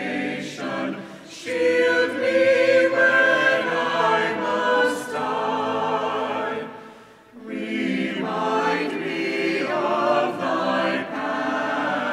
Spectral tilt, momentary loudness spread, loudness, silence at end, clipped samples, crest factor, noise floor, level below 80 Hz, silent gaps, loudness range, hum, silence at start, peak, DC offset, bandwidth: -4.5 dB/octave; 12 LU; -22 LUFS; 0 s; under 0.1%; 16 dB; -46 dBFS; -72 dBFS; none; 7 LU; none; 0 s; -6 dBFS; under 0.1%; 13 kHz